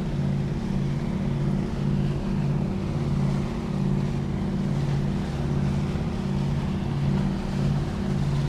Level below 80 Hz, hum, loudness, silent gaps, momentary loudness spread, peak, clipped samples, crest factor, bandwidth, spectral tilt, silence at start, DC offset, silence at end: -36 dBFS; none; -26 LUFS; none; 2 LU; -14 dBFS; under 0.1%; 12 dB; 9.8 kHz; -8 dB/octave; 0 s; under 0.1%; 0 s